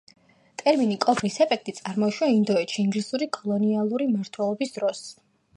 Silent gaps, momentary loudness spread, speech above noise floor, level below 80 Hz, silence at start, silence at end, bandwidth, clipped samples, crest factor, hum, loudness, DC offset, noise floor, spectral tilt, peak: none; 7 LU; 20 dB; -72 dBFS; 0.6 s; 0.45 s; 11 kHz; under 0.1%; 18 dB; none; -25 LUFS; under 0.1%; -44 dBFS; -5.5 dB/octave; -6 dBFS